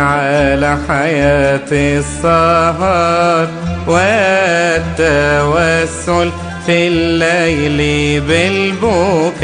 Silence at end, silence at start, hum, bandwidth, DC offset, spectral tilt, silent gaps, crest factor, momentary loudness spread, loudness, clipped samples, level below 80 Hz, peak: 0 s; 0 s; none; 10 kHz; under 0.1%; -5 dB/octave; none; 12 dB; 4 LU; -12 LUFS; under 0.1%; -30 dBFS; 0 dBFS